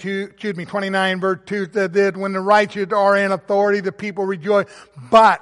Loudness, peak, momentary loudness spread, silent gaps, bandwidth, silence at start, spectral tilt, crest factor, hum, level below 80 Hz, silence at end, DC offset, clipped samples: -18 LUFS; -2 dBFS; 10 LU; none; 11.5 kHz; 0 s; -5.5 dB/octave; 16 dB; none; -60 dBFS; 0.05 s; under 0.1%; under 0.1%